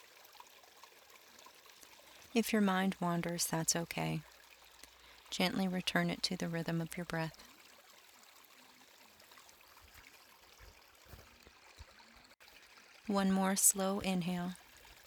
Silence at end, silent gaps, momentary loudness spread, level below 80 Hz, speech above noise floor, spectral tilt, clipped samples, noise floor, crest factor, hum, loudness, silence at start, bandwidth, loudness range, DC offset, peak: 0.15 s; none; 26 LU; -68 dBFS; 27 dB; -3.5 dB/octave; under 0.1%; -62 dBFS; 26 dB; none; -35 LUFS; 1.15 s; 19.5 kHz; 23 LU; under 0.1%; -14 dBFS